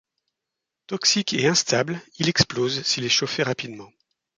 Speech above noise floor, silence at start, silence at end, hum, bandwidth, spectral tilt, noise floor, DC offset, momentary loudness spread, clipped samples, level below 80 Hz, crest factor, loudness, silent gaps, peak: 61 dB; 0.9 s; 0.5 s; none; 11 kHz; -3 dB/octave; -85 dBFS; under 0.1%; 11 LU; under 0.1%; -56 dBFS; 22 dB; -22 LUFS; none; -4 dBFS